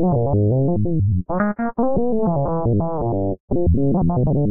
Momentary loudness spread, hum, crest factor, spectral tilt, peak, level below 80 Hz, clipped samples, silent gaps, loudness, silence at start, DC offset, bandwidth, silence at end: 4 LU; none; 10 dB; -8 dB/octave; -8 dBFS; -32 dBFS; under 0.1%; 3.40-3.48 s; -20 LUFS; 0 s; under 0.1%; 2.4 kHz; 0 s